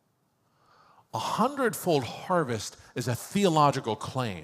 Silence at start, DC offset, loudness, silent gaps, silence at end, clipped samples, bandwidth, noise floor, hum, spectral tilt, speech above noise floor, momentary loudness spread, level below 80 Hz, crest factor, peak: 1.15 s; under 0.1%; -28 LUFS; none; 0 s; under 0.1%; 16 kHz; -71 dBFS; none; -5 dB/octave; 44 dB; 11 LU; -70 dBFS; 20 dB; -10 dBFS